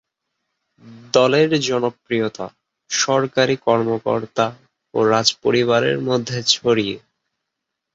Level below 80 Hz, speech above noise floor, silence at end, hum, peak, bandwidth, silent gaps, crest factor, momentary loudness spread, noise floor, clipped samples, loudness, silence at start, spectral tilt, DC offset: -60 dBFS; 61 dB; 0.95 s; none; 0 dBFS; 8 kHz; none; 20 dB; 8 LU; -80 dBFS; under 0.1%; -18 LUFS; 0.85 s; -4 dB/octave; under 0.1%